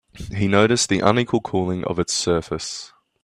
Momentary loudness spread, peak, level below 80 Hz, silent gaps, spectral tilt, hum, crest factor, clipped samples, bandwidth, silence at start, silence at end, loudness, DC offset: 12 LU; 0 dBFS; -48 dBFS; none; -4.5 dB/octave; none; 20 dB; under 0.1%; 14 kHz; 0.15 s; 0.35 s; -20 LUFS; under 0.1%